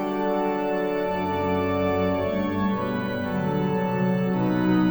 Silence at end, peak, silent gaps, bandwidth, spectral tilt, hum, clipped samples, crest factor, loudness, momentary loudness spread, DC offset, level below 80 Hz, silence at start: 0 s; -12 dBFS; none; over 20 kHz; -8.5 dB/octave; none; under 0.1%; 12 dB; -25 LUFS; 3 LU; 0.2%; -50 dBFS; 0 s